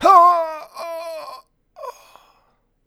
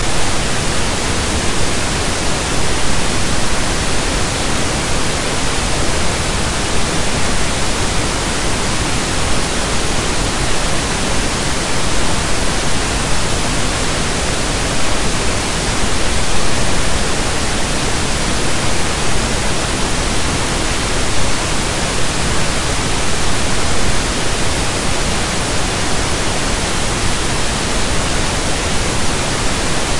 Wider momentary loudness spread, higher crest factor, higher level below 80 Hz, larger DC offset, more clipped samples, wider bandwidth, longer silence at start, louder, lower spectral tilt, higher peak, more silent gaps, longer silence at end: first, 25 LU vs 0 LU; first, 20 dB vs 14 dB; second, -62 dBFS vs -24 dBFS; neither; neither; first, over 20 kHz vs 11.5 kHz; about the same, 0 s vs 0 s; about the same, -17 LUFS vs -17 LUFS; about the same, -3 dB/octave vs -3 dB/octave; about the same, 0 dBFS vs 0 dBFS; neither; first, 0.95 s vs 0 s